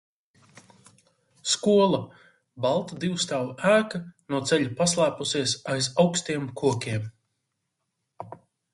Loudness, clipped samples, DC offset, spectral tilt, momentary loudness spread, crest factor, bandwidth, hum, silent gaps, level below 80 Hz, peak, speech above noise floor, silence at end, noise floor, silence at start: -25 LUFS; under 0.1%; under 0.1%; -4 dB/octave; 15 LU; 20 dB; 11.5 kHz; none; none; -64 dBFS; -8 dBFS; 55 dB; 0.4 s; -80 dBFS; 1.45 s